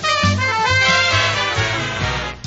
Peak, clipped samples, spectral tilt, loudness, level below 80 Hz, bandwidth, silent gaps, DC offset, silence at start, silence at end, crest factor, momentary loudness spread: -2 dBFS; under 0.1%; -2 dB/octave; -16 LUFS; -38 dBFS; 8 kHz; none; 0.2%; 0 s; 0 s; 14 dB; 8 LU